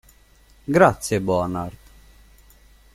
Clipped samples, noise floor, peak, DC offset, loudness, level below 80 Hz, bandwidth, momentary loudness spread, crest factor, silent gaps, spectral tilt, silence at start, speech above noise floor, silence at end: under 0.1%; -53 dBFS; -2 dBFS; under 0.1%; -20 LUFS; -48 dBFS; 16 kHz; 17 LU; 22 dB; none; -6 dB/octave; 0.7 s; 34 dB; 1.25 s